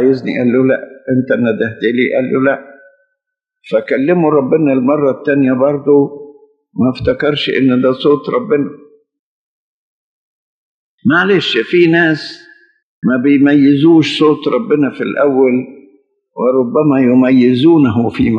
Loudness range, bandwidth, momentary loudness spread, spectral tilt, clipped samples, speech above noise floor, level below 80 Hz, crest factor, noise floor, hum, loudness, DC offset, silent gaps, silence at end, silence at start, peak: 5 LU; 7.8 kHz; 9 LU; -7.5 dB/octave; under 0.1%; 65 dB; -50 dBFS; 12 dB; -76 dBFS; none; -12 LUFS; under 0.1%; 9.19-10.98 s, 12.83-13.02 s; 0 s; 0 s; 0 dBFS